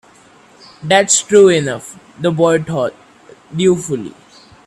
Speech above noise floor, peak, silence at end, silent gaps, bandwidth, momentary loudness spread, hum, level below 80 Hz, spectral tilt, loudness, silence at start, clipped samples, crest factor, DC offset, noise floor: 32 dB; 0 dBFS; 0.55 s; none; 13 kHz; 18 LU; none; -56 dBFS; -4 dB/octave; -14 LUFS; 0.8 s; under 0.1%; 16 dB; under 0.1%; -46 dBFS